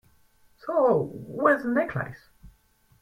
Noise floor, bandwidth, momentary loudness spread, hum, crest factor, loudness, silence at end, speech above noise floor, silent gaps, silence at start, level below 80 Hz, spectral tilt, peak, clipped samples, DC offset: -62 dBFS; 15.5 kHz; 13 LU; none; 20 dB; -25 LUFS; 0.55 s; 38 dB; none; 0.65 s; -60 dBFS; -8.5 dB/octave; -6 dBFS; under 0.1%; under 0.1%